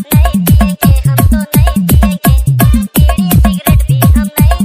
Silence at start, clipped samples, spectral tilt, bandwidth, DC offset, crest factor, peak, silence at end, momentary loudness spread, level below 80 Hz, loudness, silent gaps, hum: 0 s; 2%; -6 dB/octave; 16.5 kHz; under 0.1%; 8 dB; 0 dBFS; 0 s; 2 LU; -12 dBFS; -9 LUFS; none; none